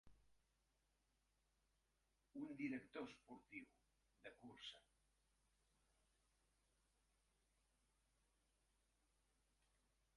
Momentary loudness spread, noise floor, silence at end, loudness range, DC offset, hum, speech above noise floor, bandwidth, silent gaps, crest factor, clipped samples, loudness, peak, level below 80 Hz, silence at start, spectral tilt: 14 LU; -87 dBFS; 5.35 s; 9 LU; under 0.1%; none; 31 dB; 11 kHz; none; 26 dB; under 0.1%; -56 LUFS; -36 dBFS; -86 dBFS; 0.05 s; -5 dB/octave